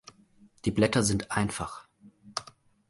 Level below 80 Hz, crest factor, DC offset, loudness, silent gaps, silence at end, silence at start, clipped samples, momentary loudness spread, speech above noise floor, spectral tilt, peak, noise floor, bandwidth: -52 dBFS; 22 dB; under 0.1%; -29 LUFS; none; 0.45 s; 0.65 s; under 0.1%; 14 LU; 32 dB; -4.5 dB/octave; -10 dBFS; -60 dBFS; 11.5 kHz